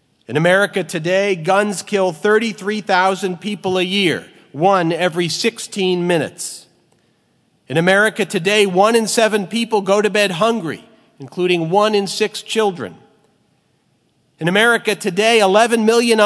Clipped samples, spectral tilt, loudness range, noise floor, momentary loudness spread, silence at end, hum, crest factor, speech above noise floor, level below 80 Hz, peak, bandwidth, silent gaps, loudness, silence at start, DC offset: under 0.1%; -4 dB/octave; 4 LU; -61 dBFS; 10 LU; 0 s; none; 16 dB; 45 dB; -70 dBFS; 0 dBFS; 11 kHz; none; -16 LUFS; 0.3 s; under 0.1%